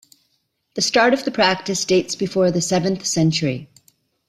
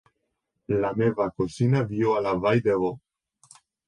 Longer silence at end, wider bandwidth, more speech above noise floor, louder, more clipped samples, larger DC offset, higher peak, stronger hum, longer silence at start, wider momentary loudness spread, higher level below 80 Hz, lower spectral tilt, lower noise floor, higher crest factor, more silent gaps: second, 0.65 s vs 0.9 s; first, 14.5 kHz vs 11 kHz; second, 50 dB vs 55 dB; first, -19 LUFS vs -25 LUFS; neither; neither; first, -2 dBFS vs -10 dBFS; neither; about the same, 0.75 s vs 0.7 s; about the same, 7 LU vs 6 LU; about the same, -58 dBFS vs -56 dBFS; second, -4 dB/octave vs -8 dB/octave; second, -69 dBFS vs -78 dBFS; about the same, 18 dB vs 16 dB; neither